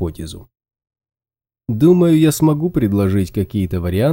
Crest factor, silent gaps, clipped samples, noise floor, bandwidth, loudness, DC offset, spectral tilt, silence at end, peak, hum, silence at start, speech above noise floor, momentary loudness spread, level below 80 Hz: 16 dB; none; under 0.1%; under -90 dBFS; 17 kHz; -16 LUFS; under 0.1%; -7.5 dB/octave; 0 s; -2 dBFS; none; 0 s; over 75 dB; 16 LU; -42 dBFS